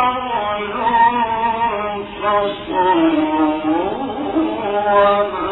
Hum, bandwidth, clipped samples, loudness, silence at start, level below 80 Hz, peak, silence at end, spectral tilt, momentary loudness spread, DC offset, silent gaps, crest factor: none; 4.1 kHz; under 0.1%; -17 LUFS; 0 s; -46 dBFS; -2 dBFS; 0 s; -9 dB/octave; 7 LU; under 0.1%; none; 16 dB